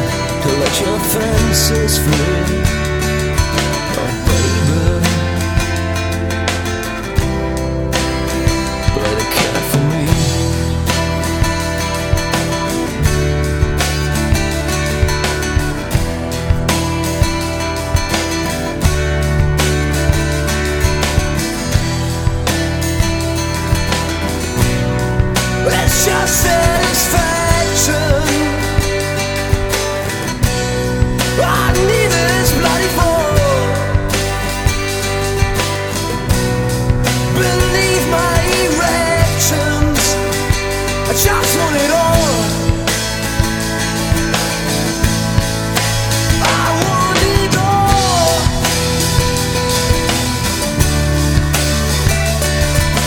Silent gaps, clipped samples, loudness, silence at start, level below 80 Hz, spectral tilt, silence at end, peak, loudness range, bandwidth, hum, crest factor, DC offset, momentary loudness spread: none; under 0.1%; -15 LUFS; 0 s; -22 dBFS; -4 dB/octave; 0 s; 0 dBFS; 3 LU; 19.5 kHz; none; 14 dB; under 0.1%; 5 LU